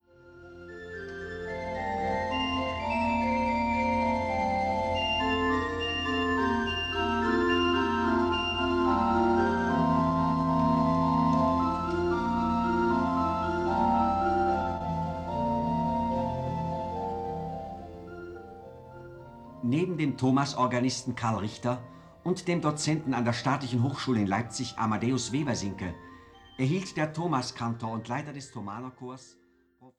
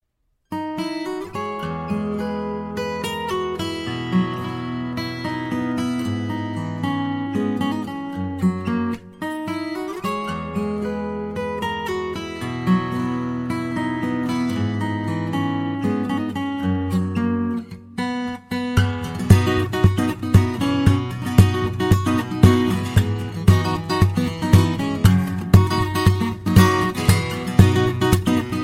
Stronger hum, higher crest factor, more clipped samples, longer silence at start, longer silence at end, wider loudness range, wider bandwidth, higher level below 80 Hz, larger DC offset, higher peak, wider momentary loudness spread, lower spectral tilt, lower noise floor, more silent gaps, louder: neither; about the same, 16 dB vs 20 dB; neither; second, 0.25 s vs 0.5 s; about the same, 0.1 s vs 0 s; about the same, 7 LU vs 8 LU; second, 10.5 kHz vs 16 kHz; second, -48 dBFS vs -38 dBFS; neither; second, -12 dBFS vs 0 dBFS; first, 15 LU vs 11 LU; about the same, -5.5 dB/octave vs -6.5 dB/octave; second, -59 dBFS vs -70 dBFS; neither; second, -28 LUFS vs -21 LUFS